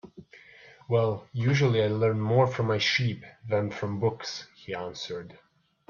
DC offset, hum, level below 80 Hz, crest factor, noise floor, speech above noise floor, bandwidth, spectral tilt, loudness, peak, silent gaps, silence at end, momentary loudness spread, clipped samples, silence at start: under 0.1%; none; -64 dBFS; 16 dB; -53 dBFS; 26 dB; 7.2 kHz; -6 dB/octave; -27 LUFS; -12 dBFS; none; 0.55 s; 13 LU; under 0.1%; 0.05 s